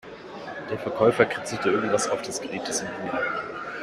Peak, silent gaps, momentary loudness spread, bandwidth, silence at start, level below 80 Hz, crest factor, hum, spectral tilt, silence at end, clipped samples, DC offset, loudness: -4 dBFS; none; 13 LU; 14 kHz; 0.05 s; -62 dBFS; 22 dB; none; -3.5 dB/octave; 0 s; under 0.1%; under 0.1%; -26 LUFS